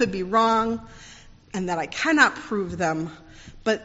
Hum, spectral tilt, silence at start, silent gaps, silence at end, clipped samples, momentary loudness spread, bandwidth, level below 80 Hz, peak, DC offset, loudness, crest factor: none; -3 dB/octave; 0 s; none; 0 s; under 0.1%; 15 LU; 8 kHz; -50 dBFS; -4 dBFS; under 0.1%; -23 LUFS; 20 dB